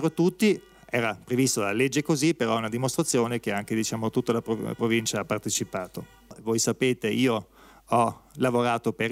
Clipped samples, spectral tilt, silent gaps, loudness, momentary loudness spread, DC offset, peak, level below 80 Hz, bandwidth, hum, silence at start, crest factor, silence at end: under 0.1%; -4.5 dB/octave; none; -26 LUFS; 6 LU; under 0.1%; -10 dBFS; -62 dBFS; 16 kHz; none; 0 s; 16 dB; 0 s